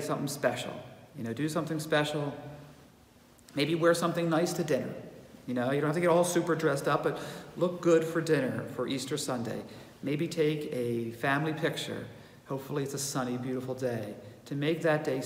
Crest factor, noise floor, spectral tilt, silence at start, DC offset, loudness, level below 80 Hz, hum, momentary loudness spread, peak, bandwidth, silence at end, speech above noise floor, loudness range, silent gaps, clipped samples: 18 dB; -58 dBFS; -5 dB/octave; 0 s; under 0.1%; -31 LUFS; -68 dBFS; none; 15 LU; -14 dBFS; 16 kHz; 0 s; 28 dB; 5 LU; none; under 0.1%